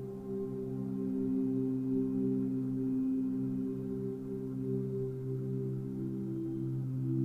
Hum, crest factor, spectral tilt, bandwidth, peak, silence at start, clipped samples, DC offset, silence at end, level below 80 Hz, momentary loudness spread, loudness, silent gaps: none; 12 dB; -11.5 dB/octave; 2.6 kHz; -22 dBFS; 0 s; under 0.1%; under 0.1%; 0 s; -62 dBFS; 6 LU; -36 LUFS; none